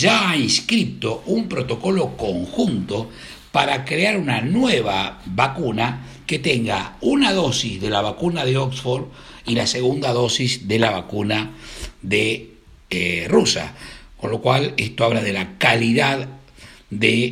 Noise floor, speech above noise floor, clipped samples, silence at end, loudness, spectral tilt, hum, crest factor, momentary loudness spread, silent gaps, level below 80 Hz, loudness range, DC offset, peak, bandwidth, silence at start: -45 dBFS; 25 dB; under 0.1%; 0 s; -20 LUFS; -4.5 dB/octave; none; 20 dB; 11 LU; none; -46 dBFS; 2 LU; under 0.1%; 0 dBFS; 16 kHz; 0 s